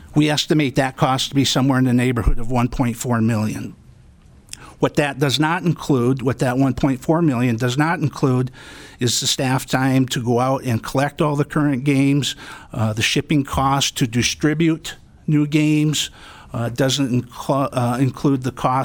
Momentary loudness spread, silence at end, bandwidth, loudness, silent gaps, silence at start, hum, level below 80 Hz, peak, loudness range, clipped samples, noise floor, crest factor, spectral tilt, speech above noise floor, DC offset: 8 LU; 0 s; 19 kHz; -19 LUFS; none; 0 s; none; -36 dBFS; -4 dBFS; 3 LU; under 0.1%; -47 dBFS; 16 dB; -5 dB/octave; 28 dB; under 0.1%